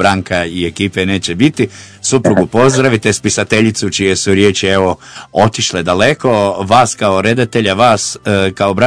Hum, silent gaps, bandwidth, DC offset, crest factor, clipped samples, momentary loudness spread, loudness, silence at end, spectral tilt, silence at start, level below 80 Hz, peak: none; none; 11 kHz; under 0.1%; 12 dB; 1%; 6 LU; -12 LUFS; 0 s; -4.5 dB/octave; 0 s; -44 dBFS; 0 dBFS